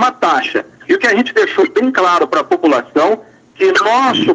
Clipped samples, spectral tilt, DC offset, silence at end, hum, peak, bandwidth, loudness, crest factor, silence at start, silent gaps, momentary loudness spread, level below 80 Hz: under 0.1%; -4 dB/octave; under 0.1%; 0 s; none; 0 dBFS; 9.4 kHz; -13 LUFS; 12 dB; 0 s; none; 5 LU; -62 dBFS